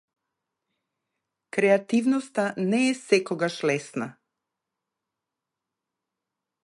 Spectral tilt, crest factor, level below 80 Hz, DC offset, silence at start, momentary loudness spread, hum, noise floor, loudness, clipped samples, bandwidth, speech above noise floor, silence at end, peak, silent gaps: -5 dB/octave; 22 dB; -78 dBFS; under 0.1%; 1.55 s; 10 LU; none; -86 dBFS; -25 LUFS; under 0.1%; 11.5 kHz; 62 dB; 2.55 s; -6 dBFS; none